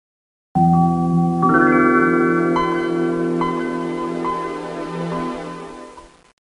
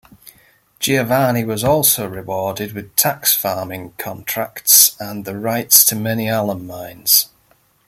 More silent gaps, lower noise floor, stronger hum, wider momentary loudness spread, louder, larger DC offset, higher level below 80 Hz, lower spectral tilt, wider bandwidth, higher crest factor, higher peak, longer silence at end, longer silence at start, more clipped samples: neither; second, -41 dBFS vs -57 dBFS; neither; second, 13 LU vs 17 LU; second, -18 LUFS vs -15 LUFS; neither; first, -48 dBFS vs -54 dBFS; first, -8 dB/octave vs -2.5 dB/octave; second, 10.5 kHz vs 17 kHz; about the same, 16 dB vs 18 dB; about the same, -2 dBFS vs 0 dBFS; about the same, 0.55 s vs 0.6 s; second, 0.55 s vs 0.8 s; neither